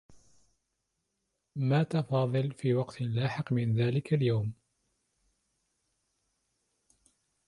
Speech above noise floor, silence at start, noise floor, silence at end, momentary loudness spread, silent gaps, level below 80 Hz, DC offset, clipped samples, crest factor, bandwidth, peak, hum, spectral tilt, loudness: 53 dB; 0.1 s; -82 dBFS; 2.95 s; 5 LU; none; -66 dBFS; under 0.1%; under 0.1%; 18 dB; 11 kHz; -16 dBFS; none; -8.5 dB/octave; -30 LUFS